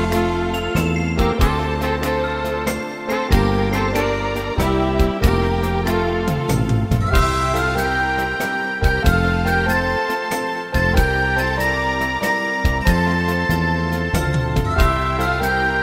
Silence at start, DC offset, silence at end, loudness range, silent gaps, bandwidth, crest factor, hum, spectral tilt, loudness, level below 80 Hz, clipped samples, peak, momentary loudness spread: 0 s; under 0.1%; 0 s; 1 LU; none; 16.5 kHz; 16 dB; none; -6 dB/octave; -19 LUFS; -24 dBFS; under 0.1%; -2 dBFS; 4 LU